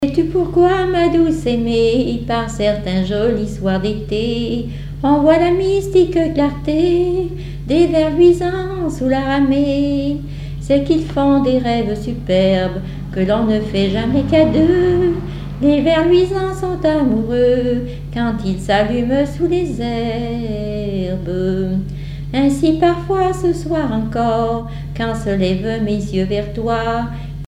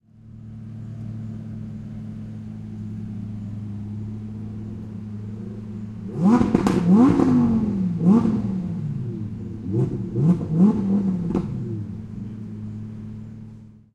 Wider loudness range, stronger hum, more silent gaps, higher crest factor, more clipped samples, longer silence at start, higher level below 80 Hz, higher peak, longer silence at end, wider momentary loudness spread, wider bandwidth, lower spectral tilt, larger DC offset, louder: second, 4 LU vs 14 LU; neither; neither; second, 14 dB vs 22 dB; neither; second, 0 s vs 0.15 s; first, -32 dBFS vs -46 dBFS; about the same, -2 dBFS vs -2 dBFS; second, 0 s vs 0.15 s; second, 9 LU vs 17 LU; first, 12 kHz vs 9 kHz; second, -7 dB/octave vs -9.5 dB/octave; neither; first, -16 LUFS vs -23 LUFS